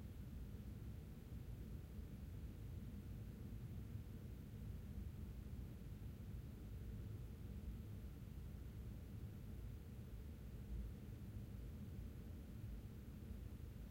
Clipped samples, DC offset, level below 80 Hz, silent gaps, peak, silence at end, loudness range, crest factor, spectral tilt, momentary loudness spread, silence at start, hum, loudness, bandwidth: under 0.1%; under 0.1%; -56 dBFS; none; -40 dBFS; 0 s; 1 LU; 12 dB; -7.5 dB/octave; 2 LU; 0 s; none; -54 LUFS; 16 kHz